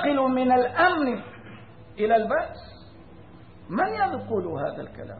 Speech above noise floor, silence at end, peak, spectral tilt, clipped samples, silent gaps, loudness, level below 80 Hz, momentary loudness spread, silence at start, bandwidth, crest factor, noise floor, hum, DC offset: 24 dB; 0 s; -8 dBFS; -10 dB/octave; under 0.1%; none; -24 LUFS; -56 dBFS; 22 LU; 0 s; 4.7 kHz; 18 dB; -48 dBFS; none; 0.2%